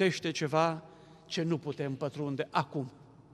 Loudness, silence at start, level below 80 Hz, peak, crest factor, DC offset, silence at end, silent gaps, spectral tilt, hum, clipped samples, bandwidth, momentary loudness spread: -33 LUFS; 0 s; -72 dBFS; -12 dBFS; 22 dB; under 0.1%; 0.1 s; none; -5.5 dB/octave; none; under 0.1%; 12 kHz; 10 LU